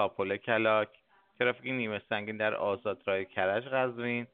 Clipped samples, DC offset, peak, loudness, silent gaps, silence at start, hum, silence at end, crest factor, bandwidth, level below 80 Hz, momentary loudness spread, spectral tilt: under 0.1%; under 0.1%; -12 dBFS; -31 LUFS; none; 0 s; none; 0.05 s; 20 dB; 4.6 kHz; -76 dBFS; 6 LU; -3 dB/octave